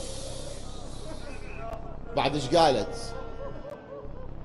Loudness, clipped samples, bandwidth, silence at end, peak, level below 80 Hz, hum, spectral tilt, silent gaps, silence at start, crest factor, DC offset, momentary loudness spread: -29 LUFS; under 0.1%; 12 kHz; 0 s; -8 dBFS; -40 dBFS; none; -4.5 dB/octave; none; 0 s; 22 dB; under 0.1%; 19 LU